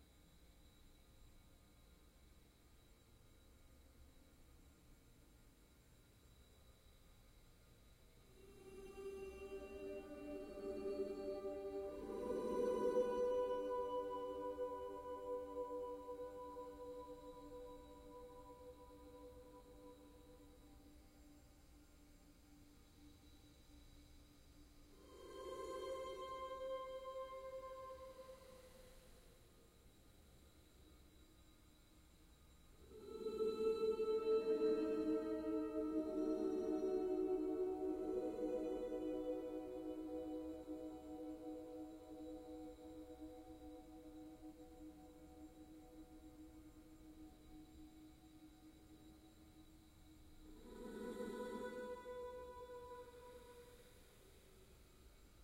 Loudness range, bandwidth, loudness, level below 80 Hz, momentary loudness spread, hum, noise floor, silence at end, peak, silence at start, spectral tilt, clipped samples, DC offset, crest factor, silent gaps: 25 LU; 16 kHz; -46 LUFS; -68 dBFS; 27 LU; none; -68 dBFS; 0 s; -28 dBFS; 0 s; -6 dB/octave; under 0.1%; under 0.1%; 20 dB; none